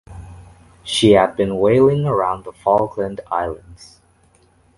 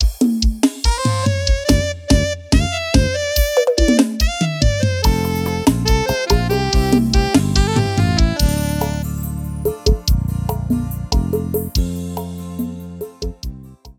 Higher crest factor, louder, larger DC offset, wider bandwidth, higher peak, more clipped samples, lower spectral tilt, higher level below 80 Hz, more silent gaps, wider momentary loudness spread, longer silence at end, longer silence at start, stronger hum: about the same, 18 dB vs 16 dB; about the same, -17 LUFS vs -18 LUFS; neither; second, 11.5 kHz vs 17 kHz; about the same, 0 dBFS vs 0 dBFS; neither; about the same, -6 dB/octave vs -5 dB/octave; second, -44 dBFS vs -22 dBFS; neither; first, 20 LU vs 11 LU; first, 0.95 s vs 0.05 s; about the same, 0.1 s vs 0 s; neither